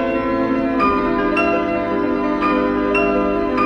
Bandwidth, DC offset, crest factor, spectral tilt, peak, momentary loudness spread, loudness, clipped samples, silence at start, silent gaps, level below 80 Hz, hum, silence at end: 9 kHz; under 0.1%; 12 dB; -7.5 dB/octave; -6 dBFS; 3 LU; -18 LUFS; under 0.1%; 0 s; none; -38 dBFS; none; 0 s